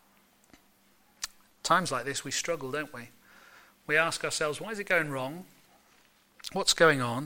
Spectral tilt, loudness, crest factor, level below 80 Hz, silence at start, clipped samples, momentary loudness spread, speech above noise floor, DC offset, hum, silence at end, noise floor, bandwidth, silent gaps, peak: -2.5 dB/octave; -29 LUFS; 24 dB; -64 dBFS; 1.2 s; under 0.1%; 17 LU; 35 dB; under 0.1%; none; 0 s; -64 dBFS; 16.5 kHz; none; -8 dBFS